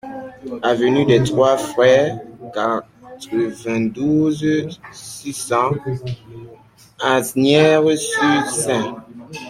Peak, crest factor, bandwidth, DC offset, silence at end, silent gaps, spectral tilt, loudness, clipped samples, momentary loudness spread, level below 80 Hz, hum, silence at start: -2 dBFS; 16 dB; 16 kHz; under 0.1%; 0 s; none; -5 dB/octave; -17 LUFS; under 0.1%; 18 LU; -54 dBFS; none; 0.05 s